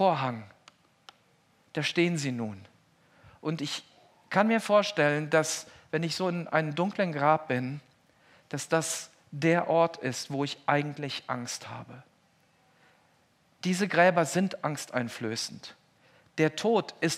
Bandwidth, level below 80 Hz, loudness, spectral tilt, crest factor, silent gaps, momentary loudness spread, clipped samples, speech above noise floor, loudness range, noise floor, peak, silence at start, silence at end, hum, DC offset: 15.5 kHz; -80 dBFS; -29 LUFS; -4.5 dB/octave; 22 dB; none; 14 LU; under 0.1%; 38 dB; 6 LU; -66 dBFS; -8 dBFS; 0 s; 0 s; none; under 0.1%